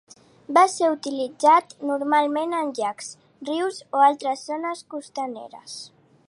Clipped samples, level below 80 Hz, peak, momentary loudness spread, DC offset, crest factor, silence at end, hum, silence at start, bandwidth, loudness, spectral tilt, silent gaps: under 0.1%; -80 dBFS; -4 dBFS; 20 LU; under 0.1%; 18 dB; 0.4 s; none; 0.5 s; 11.5 kHz; -22 LUFS; -2.5 dB/octave; none